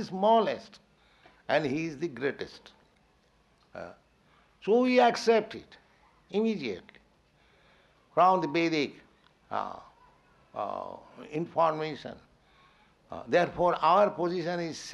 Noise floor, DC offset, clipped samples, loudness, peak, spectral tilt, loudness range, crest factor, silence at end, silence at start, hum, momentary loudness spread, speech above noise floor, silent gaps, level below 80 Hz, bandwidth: -66 dBFS; under 0.1%; under 0.1%; -28 LUFS; -10 dBFS; -5.5 dB/octave; 7 LU; 20 dB; 0 s; 0 s; none; 22 LU; 38 dB; none; -68 dBFS; 11.5 kHz